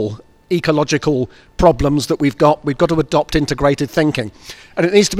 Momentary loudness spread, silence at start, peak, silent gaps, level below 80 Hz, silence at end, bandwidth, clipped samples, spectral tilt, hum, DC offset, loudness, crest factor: 12 LU; 0 s; 0 dBFS; none; -34 dBFS; 0 s; 15.5 kHz; under 0.1%; -5.5 dB/octave; none; under 0.1%; -16 LUFS; 16 dB